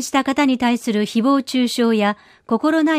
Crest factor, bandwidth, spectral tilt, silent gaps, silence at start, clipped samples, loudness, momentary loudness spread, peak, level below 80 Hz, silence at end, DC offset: 12 dB; 15.5 kHz; -4.5 dB/octave; none; 0 s; under 0.1%; -18 LUFS; 4 LU; -6 dBFS; -60 dBFS; 0 s; under 0.1%